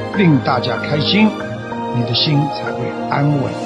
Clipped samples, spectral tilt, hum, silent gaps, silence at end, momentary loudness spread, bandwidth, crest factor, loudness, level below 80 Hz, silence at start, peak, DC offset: under 0.1%; -7 dB/octave; none; none; 0 s; 9 LU; 9 kHz; 14 dB; -16 LUFS; -50 dBFS; 0 s; -2 dBFS; under 0.1%